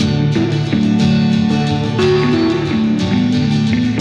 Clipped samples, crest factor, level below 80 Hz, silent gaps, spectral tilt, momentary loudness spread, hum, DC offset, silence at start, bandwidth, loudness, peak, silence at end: under 0.1%; 12 dB; -40 dBFS; none; -7 dB/octave; 3 LU; none; under 0.1%; 0 s; 9.2 kHz; -14 LUFS; -2 dBFS; 0 s